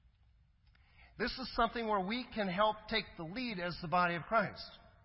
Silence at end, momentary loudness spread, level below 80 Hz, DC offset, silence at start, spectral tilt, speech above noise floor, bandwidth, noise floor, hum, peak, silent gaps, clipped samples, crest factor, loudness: 0.2 s; 8 LU; -58 dBFS; under 0.1%; 1 s; -8.5 dB/octave; 32 dB; 5.8 kHz; -68 dBFS; none; -18 dBFS; none; under 0.1%; 20 dB; -36 LUFS